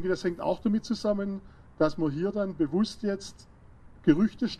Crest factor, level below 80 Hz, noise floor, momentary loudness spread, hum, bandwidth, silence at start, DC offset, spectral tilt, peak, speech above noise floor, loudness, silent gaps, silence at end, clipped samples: 20 dB; -52 dBFS; -51 dBFS; 9 LU; none; 10.5 kHz; 0 s; under 0.1%; -7 dB/octave; -8 dBFS; 24 dB; -29 LUFS; none; 0 s; under 0.1%